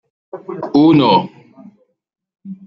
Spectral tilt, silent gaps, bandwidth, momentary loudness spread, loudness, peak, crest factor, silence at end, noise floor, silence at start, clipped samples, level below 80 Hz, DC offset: -8.5 dB/octave; none; 5.8 kHz; 25 LU; -12 LUFS; -2 dBFS; 16 dB; 0.15 s; -46 dBFS; 0.35 s; under 0.1%; -58 dBFS; under 0.1%